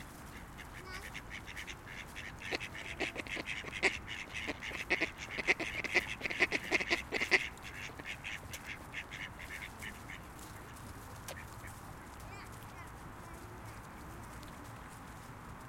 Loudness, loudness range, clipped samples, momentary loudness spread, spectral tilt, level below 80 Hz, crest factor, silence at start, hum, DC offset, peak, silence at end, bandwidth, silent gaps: -38 LUFS; 15 LU; under 0.1%; 17 LU; -3 dB/octave; -56 dBFS; 30 dB; 0 s; none; under 0.1%; -10 dBFS; 0 s; 16.5 kHz; none